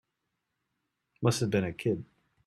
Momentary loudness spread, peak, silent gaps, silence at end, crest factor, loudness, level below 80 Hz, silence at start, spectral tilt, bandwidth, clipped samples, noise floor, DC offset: 5 LU; -12 dBFS; none; 0.4 s; 22 dB; -31 LUFS; -64 dBFS; 1.2 s; -6 dB/octave; 14 kHz; under 0.1%; -83 dBFS; under 0.1%